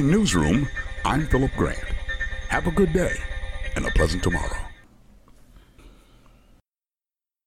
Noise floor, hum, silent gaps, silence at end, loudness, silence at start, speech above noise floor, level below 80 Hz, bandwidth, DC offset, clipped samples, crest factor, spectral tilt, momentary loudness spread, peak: under -90 dBFS; none; none; 1.55 s; -24 LUFS; 0 s; over 69 dB; -32 dBFS; 15.5 kHz; under 0.1%; under 0.1%; 16 dB; -5.5 dB/octave; 12 LU; -8 dBFS